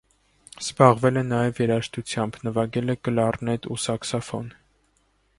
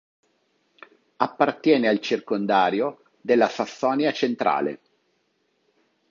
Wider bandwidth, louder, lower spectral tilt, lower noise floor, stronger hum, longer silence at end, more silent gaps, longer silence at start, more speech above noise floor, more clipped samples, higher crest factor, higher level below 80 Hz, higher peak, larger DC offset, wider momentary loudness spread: first, 11.5 kHz vs 7.4 kHz; about the same, -24 LUFS vs -23 LUFS; about the same, -5.5 dB/octave vs -5.5 dB/octave; second, -66 dBFS vs -70 dBFS; neither; second, 0.9 s vs 1.35 s; neither; second, 0.55 s vs 1.2 s; second, 43 dB vs 48 dB; neither; about the same, 24 dB vs 22 dB; first, -56 dBFS vs -74 dBFS; about the same, 0 dBFS vs -2 dBFS; neither; first, 14 LU vs 8 LU